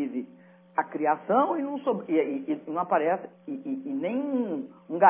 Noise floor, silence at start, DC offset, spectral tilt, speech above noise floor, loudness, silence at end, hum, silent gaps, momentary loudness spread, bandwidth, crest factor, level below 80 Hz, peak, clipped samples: -53 dBFS; 0 s; under 0.1%; -10 dB/octave; 27 dB; -29 LUFS; 0 s; none; none; 12 LU; 3.6 kHz; 22 dB; -88 dBFS; -6 dBFS; under 0.1%